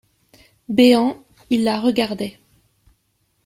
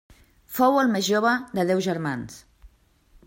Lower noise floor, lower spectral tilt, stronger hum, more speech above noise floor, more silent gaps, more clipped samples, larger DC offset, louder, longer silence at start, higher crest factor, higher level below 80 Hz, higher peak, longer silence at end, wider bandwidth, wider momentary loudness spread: first, -67 dBFS vs -58 dBFS; about the same, -5 dB/octave vs -5 dB/octave; neither; first, 50 dB vs 36 dB; neither; neither; neither; first, -18 LUFS vs -23 LUFS; first, 0.7 s vs 0.5 s; about the same, 18 dB vs 18 dB; about the same, -58 dBFS vs -58 dBFS; first, -2 dBFS vs -6 dBFS; first, 1.15 s vs 0.6 s; about the same, 15 kHz vs 16.5 kHz; about the same, 15 LU vs 14 LU